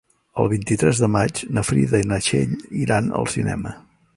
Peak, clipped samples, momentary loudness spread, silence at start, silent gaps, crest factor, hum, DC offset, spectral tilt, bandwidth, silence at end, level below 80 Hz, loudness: -2 dBFS; under 0.1%; 7 LU; 0.35 s; none; 18 dB; none; under 0.1%; -5.5 dB/octave; 11.5 kHz; 0.35 s; -44 dBFS; -21 LUFS